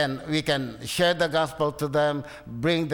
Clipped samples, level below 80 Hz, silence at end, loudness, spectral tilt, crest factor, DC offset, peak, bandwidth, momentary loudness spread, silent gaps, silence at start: under 0.1%; -54 dBFS; 0 s; -25 LUFS; -5 dB/octave; 14 dB; under 0.1%; -12 dBFS; over 20 kHz; 7 LU; none; 0 s